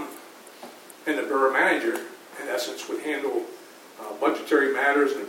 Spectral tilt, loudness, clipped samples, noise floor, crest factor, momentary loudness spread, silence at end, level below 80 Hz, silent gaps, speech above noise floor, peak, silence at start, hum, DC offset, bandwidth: -2.5 dB/octave; -25 LUFS; under 0.1%; -45 dBFS; 18 dB; 23 LU; 0 s; under -90 dBFS; none; 21 dB; -8 dBFS; 0 s; none; under 0.1%; 17 kHz